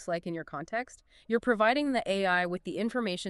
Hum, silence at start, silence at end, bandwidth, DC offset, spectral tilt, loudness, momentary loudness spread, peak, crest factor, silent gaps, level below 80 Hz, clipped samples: none; 0 s; 0 s; 11.5 kHz; under 0.1%; -5 dB/octave; -30 LUFS; 11 LU; -14 dBFS; 18 dB; none; -64 dBFS; under 0.1%